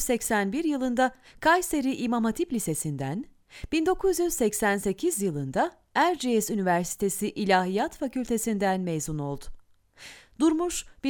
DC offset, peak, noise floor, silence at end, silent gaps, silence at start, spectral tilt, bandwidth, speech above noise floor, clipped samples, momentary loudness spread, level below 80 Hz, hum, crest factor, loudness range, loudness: under 0.1%; -10 dBFS; -53 dBFS; 0 s; none; 0 s; -4.5 dB/octave; over 20 kHz; 26 dB; under 0.1%; 9 LU; -50 dBFS; none; 18 dB; 2 LU; -27 LUFS